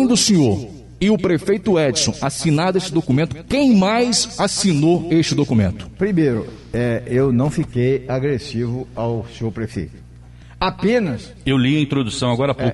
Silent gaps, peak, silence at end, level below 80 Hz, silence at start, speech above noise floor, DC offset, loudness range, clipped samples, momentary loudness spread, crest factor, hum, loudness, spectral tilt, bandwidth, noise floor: none; -4 dBFS; 0 s; -42 dBFS; 0 s; 23 dB; under 0.1%; 6 LU; under 0.1%; 10 LU; 14 dB; none; -18 LUFS; -5 dB/octave; 11.5 kHz; -40 dBFS